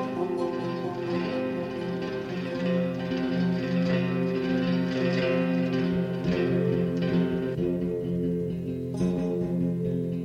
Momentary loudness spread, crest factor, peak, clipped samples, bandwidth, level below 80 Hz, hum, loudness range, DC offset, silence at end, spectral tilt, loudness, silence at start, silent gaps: 6 LU; 14 dB; -14 dBFS; under 0.1%; 7 kHz; -54 dBFS; none; 3 LU; under 0.1%; 0 s; -8 dB/octave; -28 LUFS; 0 s; none